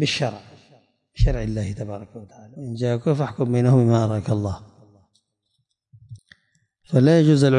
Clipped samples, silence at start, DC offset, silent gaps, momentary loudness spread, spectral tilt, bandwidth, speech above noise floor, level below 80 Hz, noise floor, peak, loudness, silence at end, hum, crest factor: under 0.1%; 0 s; under 0.1%; none; 21 LU; -7 dB/octave; 10.5 kHz; 54 dB; -34 dBFS; -73 dBFS; -6 dBFS; -21 LUFS; 0 s; none; 16 dB